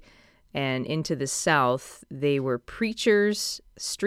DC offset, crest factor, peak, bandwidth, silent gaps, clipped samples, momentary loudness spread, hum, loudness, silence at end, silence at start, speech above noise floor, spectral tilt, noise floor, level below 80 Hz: under 0.1%; 18 dB; -8 dBFS; 15 kHz; none; under 0.1%; 11 LU; none; -26 LUFS; 0 s; 0.55 s; 31 dB; -4 dB/octave; -57 dBFS; -58 dBFS